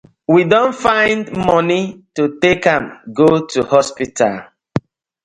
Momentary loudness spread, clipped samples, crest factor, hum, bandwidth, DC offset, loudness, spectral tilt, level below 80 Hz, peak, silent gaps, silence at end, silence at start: 12 LU; under 0.1%; 16 dB; none; 11 kHz; under 0.1%; -15 LUFS; -5.5 dB/octave; -48 dBFS; 0 dBFS; none; 0.45 s; 0.3 s